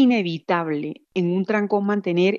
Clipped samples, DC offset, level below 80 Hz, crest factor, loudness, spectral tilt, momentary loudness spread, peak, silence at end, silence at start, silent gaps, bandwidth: under 0.1%; under 0.1%; -78 dBFS; 14 dB; -22 LUFS; -7.5 dB/octave; 7 LU; -8 dBFS; 0 s; 0 s; none; 7 kHz